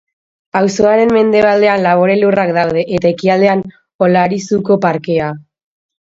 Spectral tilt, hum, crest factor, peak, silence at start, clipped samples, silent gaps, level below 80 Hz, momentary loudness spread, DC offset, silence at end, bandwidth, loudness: -6.5 dB/octave; none; 12 dB; 0 dBFS; 0.55 s; under 0.1%; 3.94-3.99 s; -50 dBFS; 7 LU; under 0.1%; 0.75 s; 7.8 kHz; -12 LUFS